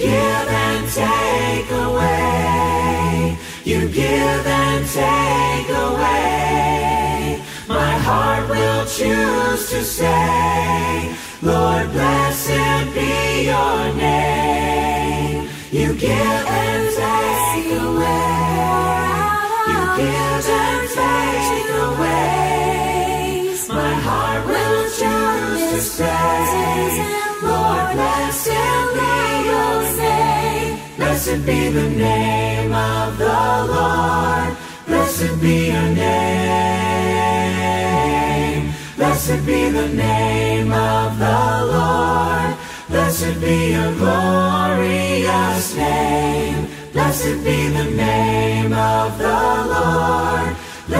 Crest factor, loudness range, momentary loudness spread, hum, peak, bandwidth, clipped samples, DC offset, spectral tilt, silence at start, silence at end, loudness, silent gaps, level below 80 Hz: 14 dB; 1 LU; 4 LU; none; -2 dBFS; 16 kHz; under 0.1%; under 0.1%; -5 dB/octave; 0 s; 0 s; -17 LUFS; none; -34 dBFS